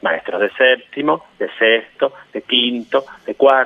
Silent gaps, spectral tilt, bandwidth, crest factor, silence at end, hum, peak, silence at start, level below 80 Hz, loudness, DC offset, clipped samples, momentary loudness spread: none; -5 dB/octave; 5.2 kHz; 16 dB; 0 s; none; 0 dBFS; 0.05 s; -66 dBFS; -17 LUFS; under 0.1%; under 0.1%; 8 LU